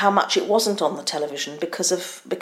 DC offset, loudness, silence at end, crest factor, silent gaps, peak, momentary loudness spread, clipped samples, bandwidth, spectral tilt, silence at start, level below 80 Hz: under 0.1%; -22 LUFS; 0 s; 20 dB; none; -2 dBFS; 8 LU; under 0.1%; 16 kHz; -2.5 dB/octave; 0 s; -72 dBFS